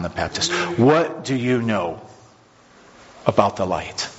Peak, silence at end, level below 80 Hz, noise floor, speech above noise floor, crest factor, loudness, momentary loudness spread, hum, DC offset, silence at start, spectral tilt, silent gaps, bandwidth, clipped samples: 0 dBFS; 0 s; -50 dBFS; -51 dBFS; 31 dB; 22 dB; -20 LUFS; 9 LU; none; under 0.1%; 0 s; -4.5 dB/octave; none; 8 kHz; under 0.1%